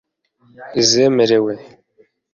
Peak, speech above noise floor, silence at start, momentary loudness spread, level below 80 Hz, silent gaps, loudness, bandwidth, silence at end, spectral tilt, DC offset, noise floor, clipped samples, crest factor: 0 dBFS; 41 dB; 0.6 s; 12 LU; -58 dBFS; none; -15 LUFS; 7.6 kHz; 0.7 s; -3.5 dB/octave; under 0.1%; -56 dBFS; under 0.1%; 18 dB